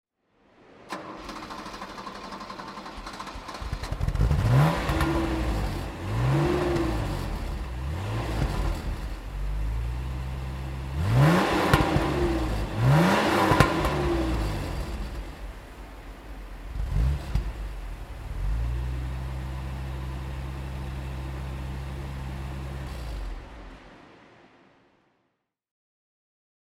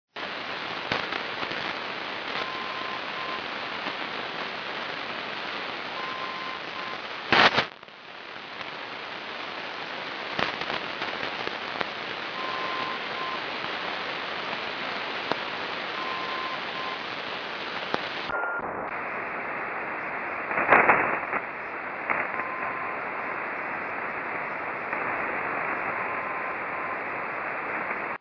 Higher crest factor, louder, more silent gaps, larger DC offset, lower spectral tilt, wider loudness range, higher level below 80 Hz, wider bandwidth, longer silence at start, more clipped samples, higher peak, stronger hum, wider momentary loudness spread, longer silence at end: about the same, 26 dB vs 26 dB; about the same, -28 LUFS vs -29 LUFS; neither; neither; first, -6.5 dB/octave vs -4 dB/octave; first, 15 LU vs 6 LU; first, -34 dBFS vs -64 dBFS; first, 16 kHz vs 5.4 kHz; first, 0.75 s vs 0.15 s; neither; about the same, -2 dBFS vs -4 dBFS; neither; first, 17 LU vs 6 LU; first, 2.65 s vs 0.05 s